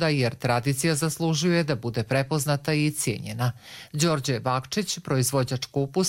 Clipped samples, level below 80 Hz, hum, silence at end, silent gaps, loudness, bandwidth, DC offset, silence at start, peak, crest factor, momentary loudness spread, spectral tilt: under 0.1%; -56 dBFS; none; 0 s; none; -25 LUFS; 16.5 kHz; under 0.1%; 0 s; -8 dBFS; 16 dB; 5 LU; -4.5 dB/octave